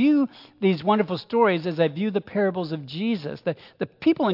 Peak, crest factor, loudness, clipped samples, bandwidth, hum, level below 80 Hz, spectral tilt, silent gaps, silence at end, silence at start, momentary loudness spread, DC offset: -8 dBFS; 16 dB; -24 LUFS; under 0.1%; 5.8 kHz; none; -70 dBFS; -9 dB/octave; none; 0 s; 0 s; 10 LU; under 0.1%